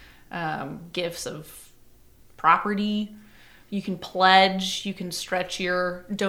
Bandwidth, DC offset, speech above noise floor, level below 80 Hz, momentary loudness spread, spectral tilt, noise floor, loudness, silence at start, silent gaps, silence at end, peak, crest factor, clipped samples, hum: 17 kHz; under 0.1%; 28 dB; -58 dBFS; 17 LU; -4 dB/octave; -52 dBFS; -24 LUFS; 0 s; none; 0 s; -2 dBFS; 24 dB; under 0.1%; none